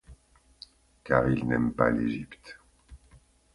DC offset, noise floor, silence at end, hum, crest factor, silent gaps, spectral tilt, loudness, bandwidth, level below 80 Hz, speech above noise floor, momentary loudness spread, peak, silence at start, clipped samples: under 0.1%; -59 dBFS; 0.6 s; none; 24 dB; none; -8.5 dB/octave; -27 LUFS; 11.5 kHz; -50 dBFS; 32 dB; 25 LU; -6 dBFS; 0.1 s; under 0.1%